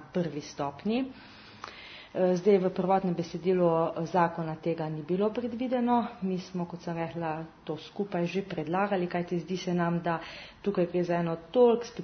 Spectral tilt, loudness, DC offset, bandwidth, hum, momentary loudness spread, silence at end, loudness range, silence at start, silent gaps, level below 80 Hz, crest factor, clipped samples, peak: -7.5 dB/octave; -30 LUFS; under 0.1%; 6.6 kHz; none; 14 LU; 0 s; 4 LU; 0 s; none; -64 dBFS; 18 dB; under 0.1%; -10 dBFS